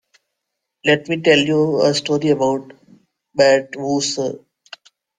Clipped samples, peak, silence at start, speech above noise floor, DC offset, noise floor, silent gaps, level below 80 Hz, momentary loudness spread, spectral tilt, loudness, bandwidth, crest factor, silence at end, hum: under 0.1%; -2 dBFS; 0.85 s; 62 dB; under 0.1%; -78 dBFS; none; -62 dBFS; 11 LU; -4.5 dB/octave; -17 LUFS; 9.6 kHz; 18 dB; 0.8 s; none